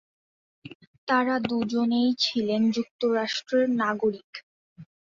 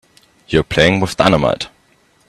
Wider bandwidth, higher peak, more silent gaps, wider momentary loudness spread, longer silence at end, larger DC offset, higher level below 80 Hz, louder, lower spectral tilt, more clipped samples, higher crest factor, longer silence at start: second, 7.4 kHz vs 13.5 kHz; second, -10 dBFS vs 0 dBFS; first, 0.75-0.80 s, 0.87-1.07 s, 2.91-2.99 s, 4.24-4.33 s, 4.43-4.76 s vs none; about the same, 10 LU vs 9 LU; second, 0.25 s vs 0.6 s; neither; second, -68 dBFS vs -38 dBFS; second, -25 LUFS vs -15 LUFS; about the same, -5 dB/octave vs -5.5 dB/octave; neither; about the same, 18 dB vs 16 dB; first, 0.65 s vs 0.5 s